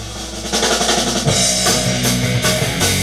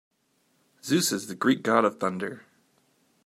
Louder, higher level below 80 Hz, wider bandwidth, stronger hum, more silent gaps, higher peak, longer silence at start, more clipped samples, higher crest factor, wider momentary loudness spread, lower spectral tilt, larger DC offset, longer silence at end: first, -15 LUFS vs -26 LUFS; first, -34 dBFS vs -76 dBFS; about the same, 17 kHz vs 16 kHz; neither; neither; first, 0 dBFS vs -6 dBFS; second, 0 s vs 0.85 s; neither; second, 16 dB vs 22 dB; second, 5 LU vs 15 LU; about the same, -3 dB/octave vs -4 dB/octave; first, 0.4% vs under 0.1%; second, 0 s vs 0.85 s